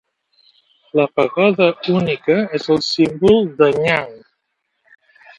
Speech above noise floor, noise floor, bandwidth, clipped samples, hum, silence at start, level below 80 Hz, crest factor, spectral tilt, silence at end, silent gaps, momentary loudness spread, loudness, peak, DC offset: 56 dB; -72 dBFS; 10.5 kHz; under 0.1%; none; 0.95 s; -52 dBFS; 18 dB; -6 dB/octave; 1.2 s; none; 5 LU; -16 LUFS; 0 dBFS; under 0.1%